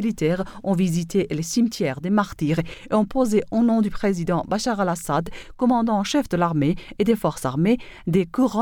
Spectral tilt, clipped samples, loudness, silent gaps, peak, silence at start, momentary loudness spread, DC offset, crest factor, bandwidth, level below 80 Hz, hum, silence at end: -6 dB/octave; under 0.1%; -22 LUFS; none; -6 dBFS; 0 s; 4 LU; under 0.1%; 16 dB; 18 kHz; -46 dBFS; none; 0 s